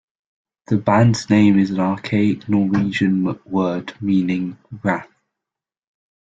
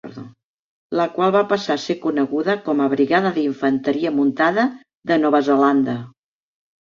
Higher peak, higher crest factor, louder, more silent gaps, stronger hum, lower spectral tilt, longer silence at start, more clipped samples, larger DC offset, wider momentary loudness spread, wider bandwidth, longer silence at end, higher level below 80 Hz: about the same, -2 dBFS vs -4 dBFS; about the same, 18 dB vs 16 dB; about the same, -18 LUFS vs -19 LUFS; second, none vs 0.44-0.90 s, 4.95-5.02 s; neither; about the same, -7 dB/octave vs -6.5 dB/octave; first, 0.7 s vs 0.05 s; neither; neither; about the same, 9 LU vs 8 LU; about the same, 8 kHz vs 7.4 kHz; first, 1.2 s vs 0.75 s; first, -56 dBFS vs -64 dBFS